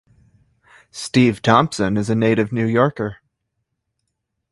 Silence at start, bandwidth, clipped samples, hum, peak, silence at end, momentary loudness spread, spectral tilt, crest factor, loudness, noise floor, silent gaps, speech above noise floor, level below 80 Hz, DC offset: 0.95 s; 11.5 kHz; under 0.1%; none; 0 dBFS; 1.4 s; 12 LU; -6 dB/octave; 20 dB; -18 LUFS; -76 dBFS; none; 59 dB; -52 dBFS; under 0.1%